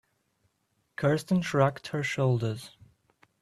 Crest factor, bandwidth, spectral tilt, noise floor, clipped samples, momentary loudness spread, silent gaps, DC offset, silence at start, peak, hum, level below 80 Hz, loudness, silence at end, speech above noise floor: 22 dB; 13.5 kHz; -6.5 dB/octave; -75 dBFS; under 0.1%; 14 LU; none; under 0.1%; 1 s; -8 dBFS; none; -66 dBFS; -28 LUFS; 0.75 s; 48 dB